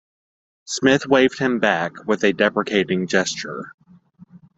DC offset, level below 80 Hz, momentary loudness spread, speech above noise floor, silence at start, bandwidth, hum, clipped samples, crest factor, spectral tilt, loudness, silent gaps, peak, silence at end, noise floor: under 0.1%; -62 dBFS; 12 LU; 29 dB; 0.7 s; 8.2 kHz; none; under 0.1%; 20 dB; -4 dB/octave; -19 LUFS; 3.74-3.78 s; -2 dBFS; 0.2 s; -49 dBFS